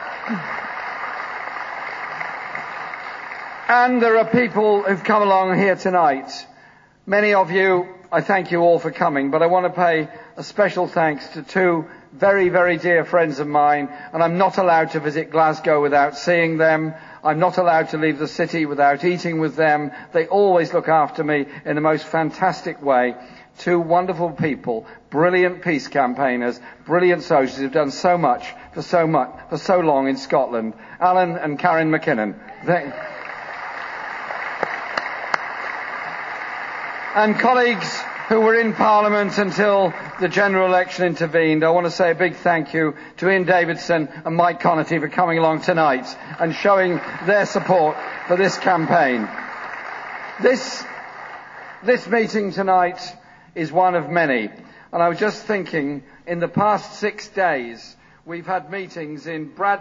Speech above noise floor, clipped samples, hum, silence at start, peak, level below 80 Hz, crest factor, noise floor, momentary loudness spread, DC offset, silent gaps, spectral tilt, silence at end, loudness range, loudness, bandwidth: 31 dB; under 0.1%; none; 0 s; 0 dBFS; -62 dBFS; 20 dB; -50 dBFS; 13 LU; under 0.1%; none; -6 dB/octave; 0 s; 5 LU; -19 LUFS; 7.6 kHz